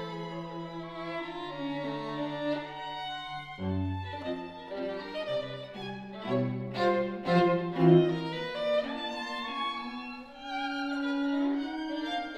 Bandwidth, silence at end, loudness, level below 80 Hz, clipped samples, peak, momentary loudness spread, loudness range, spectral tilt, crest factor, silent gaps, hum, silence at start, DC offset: 9.4 kHz; 0 s; -32 LUFS; -64 dBFS; under 0.1%; -10 dBFS; 14 LU; 8 LU; -7.5 dB/octave; 22 dB; none; none; 0 s; under 0.1%